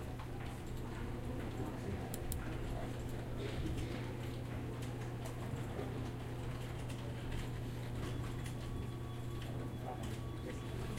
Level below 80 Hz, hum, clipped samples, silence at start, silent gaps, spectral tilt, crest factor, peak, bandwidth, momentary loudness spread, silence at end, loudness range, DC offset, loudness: -48 dBFS; none; under 0.1%; 0 s; none; -6.5 dB/octave; 18 dB; -24 dBFS; 16 kHz; 2 LU; 0 s; 1 LU; under 0.1%; -44 LUFS